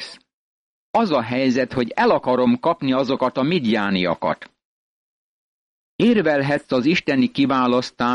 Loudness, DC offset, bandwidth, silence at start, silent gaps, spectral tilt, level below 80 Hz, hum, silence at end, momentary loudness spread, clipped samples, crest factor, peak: -19 LUFS; under 0.1%; 9.8 kHz; 0 s; 0.33-0.94 s, 4.65-5.99 s; -6.5 dB/octave; -58 dBFS; none; 0 s; 4 LU; under 0.1%; 14 dB; -8 dBFS